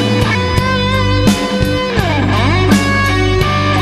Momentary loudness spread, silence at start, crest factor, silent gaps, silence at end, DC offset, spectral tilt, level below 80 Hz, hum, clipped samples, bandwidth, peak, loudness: 3 LU; 0 s; 12 dB; none; 0 s; under 0.1%; -5.5 dB/octave; -24 dBFS; none; under 0.1%; 14 kHz; 0 dBFS; -13 LUFS